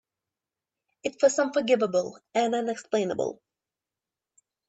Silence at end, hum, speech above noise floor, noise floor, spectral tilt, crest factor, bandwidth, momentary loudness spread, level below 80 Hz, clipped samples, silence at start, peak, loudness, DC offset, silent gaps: 1.35 s; none; 64 dB; -90 dBFS; -4 dB/octave; 20 dB; 8.4 kHz; 9 LU; -76 dBFS; under 0.1%; 1.05 s; -10 dBFS; -27 LUFS; under 0.1%; none